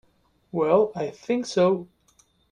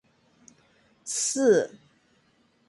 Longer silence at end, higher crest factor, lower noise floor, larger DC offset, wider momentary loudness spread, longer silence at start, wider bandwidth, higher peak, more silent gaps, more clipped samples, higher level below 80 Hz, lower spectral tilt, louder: second, 0.65 s vs 1 s; about the same, 18 dB vs 20 dB; about the same, -64 dBFS vs -66 dBFS; neither; second, 10 LU vs 15 LU; second, 0.55 s vs 1.05 s; about the same, 10.5 kHz vs 11.5 kHz; about the same, -8 dBFS vs -10 dBFS; neither; neither; first, -66 dBFS vs -76 dBFS; first, -6 dB/octave vs -3 dB/octave; about the same, -24 LUFS vs -24 LUFS